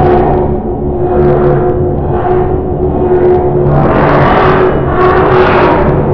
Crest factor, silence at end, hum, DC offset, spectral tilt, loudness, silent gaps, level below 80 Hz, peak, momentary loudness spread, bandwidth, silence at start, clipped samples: 8 dB; 0 s; none; under 0.1%; -10 dB/octave; -9 LUFS; none; -20 dBFS; 0 dBFS; 6 LU; 5.4 kHz; 0 s; 1%